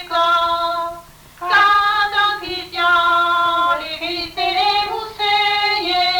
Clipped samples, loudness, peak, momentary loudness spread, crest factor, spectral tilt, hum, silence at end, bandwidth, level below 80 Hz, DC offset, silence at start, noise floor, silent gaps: under 0.1%; -16 LUFS; -4 dBFS; 10 LU; 12 dB; -2 dB/octave; none; 0 s; 19 kHz; -48 dBFS; under 0.1%; 0 s; -38 dBFS; none